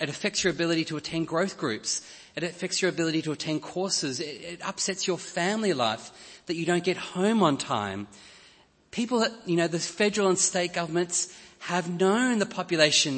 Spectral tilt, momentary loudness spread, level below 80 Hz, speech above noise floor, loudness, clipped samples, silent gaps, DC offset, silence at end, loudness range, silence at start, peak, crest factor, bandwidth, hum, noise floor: -3.5 dB/octave; 11 LU; -68 dBFS; 31 dB; -27 LUFS; under 0.1%; none; under 0.1%; 0 s; 3 LU; 0 s; -6 dBFS; 20 dB; 8.8 kHz; none; -58 dBFS